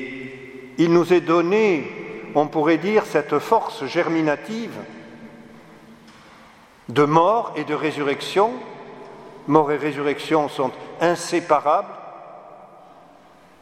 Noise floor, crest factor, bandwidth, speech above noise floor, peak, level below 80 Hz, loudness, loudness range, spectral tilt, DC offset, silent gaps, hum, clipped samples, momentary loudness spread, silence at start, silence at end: -50 dBFS; 22 dB; 14.5 kHz; 30 dB; 0 dBFS; -66 dBFS; -20 LUFS; 5 LU; -6 dB/octave; under 0.1%; none; none; under 0.1%; 21 LU; 0 s; 0.95 s